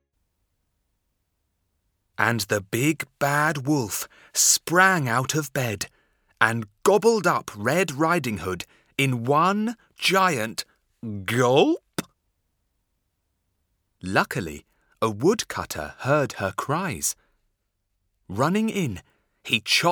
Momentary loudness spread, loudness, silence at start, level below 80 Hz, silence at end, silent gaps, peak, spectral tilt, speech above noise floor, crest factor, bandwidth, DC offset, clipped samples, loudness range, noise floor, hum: 15 LU; -23 LUFS; 2.2 s; -60 dBFS; 0 s; none; 0 dBFS; -3.5 dB/octave; 52 dB; 24 dB; over 20 kHz; under 0.1%; under 0.1%; 7 LU; -76 dBFS; none